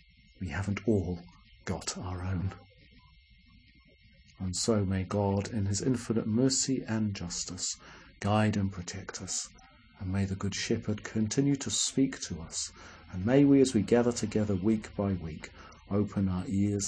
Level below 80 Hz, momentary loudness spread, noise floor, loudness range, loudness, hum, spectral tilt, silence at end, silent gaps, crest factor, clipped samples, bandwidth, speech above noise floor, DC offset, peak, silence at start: -56 dBFS; 13 LU; -60 dBFS; 8 LU; -30 LUFS; none; -5 dB/octave; 0 s; none; 20 dB; under 0.1%; 10.5 kHz; 30 dB; under 0.1%; -12 dBFS; 0.4 s